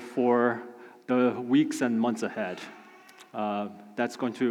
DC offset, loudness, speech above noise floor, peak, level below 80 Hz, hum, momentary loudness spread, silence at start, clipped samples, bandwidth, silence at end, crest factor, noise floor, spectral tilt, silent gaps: under 0.1%; -28 LUFS; 25 dB; -12 dBFS; -90 dBFS; none; 17 LU; 0 s; under 0.1%; 13.5 kHz; 0 s; 16 dB; -52 dBFS; -5.5 dB/octave; none